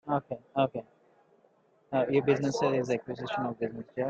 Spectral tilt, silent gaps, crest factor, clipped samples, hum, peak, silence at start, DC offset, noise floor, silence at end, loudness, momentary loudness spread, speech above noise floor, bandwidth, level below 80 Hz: -6.5 dB/octave; none; 20 dB; under 0.1%; none; -12 dBFS; 0.05 s; under 0.1%; -66 dBFS; 0 s; -30 LUFS; 9 LU; 36 dB; 8 kHz; -70 dBFS